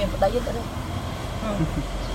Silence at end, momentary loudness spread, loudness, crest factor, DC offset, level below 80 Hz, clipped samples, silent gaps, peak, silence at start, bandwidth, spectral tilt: 0 s; 7 LU; -27 LUFS; 18 dB; under 0.1%; -32 dBFS; under 0.1%; none; -8 dBFS; 0 s; 16.5 kHz; -6 dB/octave